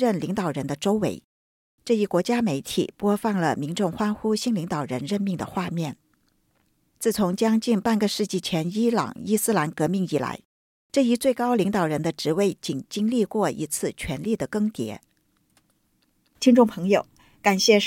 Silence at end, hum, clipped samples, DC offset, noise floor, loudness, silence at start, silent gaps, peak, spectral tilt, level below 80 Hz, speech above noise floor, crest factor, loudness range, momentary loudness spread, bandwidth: 0 s; none; under 0.1%; under 0.1%; -68 dBFS; -24 LUFS; 0 s; 1.24-1.78 s, 10.45-10.90 s; -4 dBFS; -5 dB/octave; -58 dBFS; 44 dB; 20 dB; 4 LU; 8 LU; 17 kHz